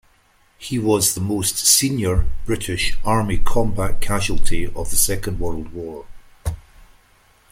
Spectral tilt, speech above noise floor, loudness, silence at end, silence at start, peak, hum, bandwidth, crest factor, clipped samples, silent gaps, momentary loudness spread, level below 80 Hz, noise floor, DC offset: -3.5 dB/octave; 41 dB; -20 LUFS; 0.9 s; 0.6 s; 0 dBFS; none; 16.5 kHz; 18 dB; under 0.1%; none; 16 LU; -26 dBFS; -57 dBFS; under 0.1%